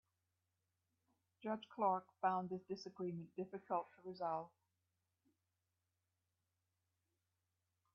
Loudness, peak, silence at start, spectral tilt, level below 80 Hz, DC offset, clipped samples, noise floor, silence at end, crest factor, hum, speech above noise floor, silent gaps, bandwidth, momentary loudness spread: -44 LUFS; -26 dBFS; 1.4 s; -5.5 dB/octave; under -90 dBFS; under 0.1%; under 0.1%; -89 dBFS; 3.45 s; 22 dB; none; 46 dB; none; 6.2 kHz; 11 LU